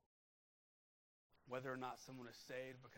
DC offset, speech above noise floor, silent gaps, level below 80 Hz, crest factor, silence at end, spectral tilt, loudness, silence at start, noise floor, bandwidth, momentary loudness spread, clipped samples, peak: under 0.1%; over 38 dB; none; -86 dBFS; 22 dB; 0 s; -5 dB/octave; -52 LUFS; 1.3 s; under -90 dBFS; 16 kHz; 8 LU; under 0.1%; -34 dBFS